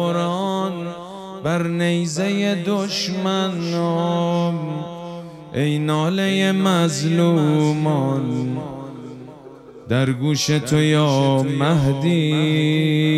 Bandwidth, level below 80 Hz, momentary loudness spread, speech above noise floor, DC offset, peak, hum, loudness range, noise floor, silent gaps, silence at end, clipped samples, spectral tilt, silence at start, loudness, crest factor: 13.5 kHz; -52 dBFS; 14 LU; 22 dB; under 0.1%; -4 dBFS; none; 4 LU; -40 dBFS; none; 0 s; under 0.1%; -6 dB/octave; 0 s; -19 LUFS; 14 dB